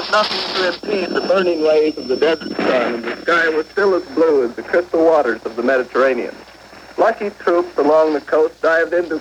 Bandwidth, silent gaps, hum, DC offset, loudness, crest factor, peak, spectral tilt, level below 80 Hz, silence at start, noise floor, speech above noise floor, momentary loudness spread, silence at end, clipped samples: 10.5 kHz; none; none; under 0.1%; -17 LUFS; 14 dB; -2 dBFS; -4.5 dB/octave; -56 dBFS; 0 s; -40 dBFS; 23 dB; 6 LU; 0 s; under 0.1%